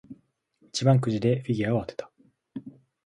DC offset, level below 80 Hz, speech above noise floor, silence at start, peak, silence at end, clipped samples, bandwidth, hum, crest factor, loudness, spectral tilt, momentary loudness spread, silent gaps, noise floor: under 0.1%; -60 dBFS; 41 dB; 0.1 s; -6 dBFS; 0.35 s; under 0.1%; 11 kHz; none; 20 dB; -25 LUFS; -6.5 dB/octave; 20 LU; none; -65 dBFS